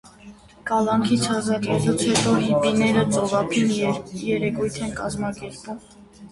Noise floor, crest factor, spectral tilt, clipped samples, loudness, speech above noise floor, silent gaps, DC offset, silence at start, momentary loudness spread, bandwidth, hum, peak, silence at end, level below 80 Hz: -46 dBFS; 16 dB; -5 dB/octave; under 0.1%; -22 LUFS; 24 dB; none; under 0.1%; 0.05 s; 13 LU; 11.5 kHz; none; -6 dBFS; 0.05 s; -50 dBFS